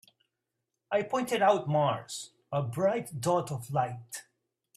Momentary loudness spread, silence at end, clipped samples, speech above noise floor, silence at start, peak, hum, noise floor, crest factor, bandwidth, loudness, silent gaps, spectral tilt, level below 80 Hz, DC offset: 15 LU; 0.55 s; under 0.1%; 56 dB; 0.9 s; -12 dBFS; none; -85 dBFS; 18 dB; 15 kHz; -30 LUFS; none; -5.5 dB/octave; -72 dBFS; under 0.1%